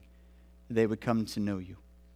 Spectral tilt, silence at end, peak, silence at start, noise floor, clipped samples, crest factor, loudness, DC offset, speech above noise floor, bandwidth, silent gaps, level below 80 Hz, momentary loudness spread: -6.5 dB/octave; 0.35 s; -14 dBFS; 0.7 s; -57 dBFS; under 0.1%; 20 dB; -32 LUFS; under 0.1%; 26 dB; 15.5 kHz; none; -58 dBFS; 9 LU